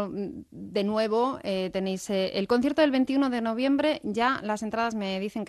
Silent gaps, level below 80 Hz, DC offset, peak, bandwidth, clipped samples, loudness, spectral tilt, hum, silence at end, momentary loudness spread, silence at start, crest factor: none; -62 dBFS; under 0.1%; -8 dBFS; 12.5 kHz; under 0.1%; -27 LUFS; -5.5 dB/octave; none; 0 s; 7 LU; 0 s; 18 dB